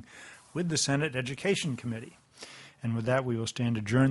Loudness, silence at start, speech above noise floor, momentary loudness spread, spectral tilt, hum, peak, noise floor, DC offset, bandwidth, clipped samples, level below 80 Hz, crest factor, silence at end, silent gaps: -30 LUFS; 0.1 s; 22 dB; 20 LU; -5 dB/octave; none; -12 dBFS; -51 dBFS; under 0.1%; 11.5 kHz; under 0.1%; -62 dBFS; 20 dB; 0 s; none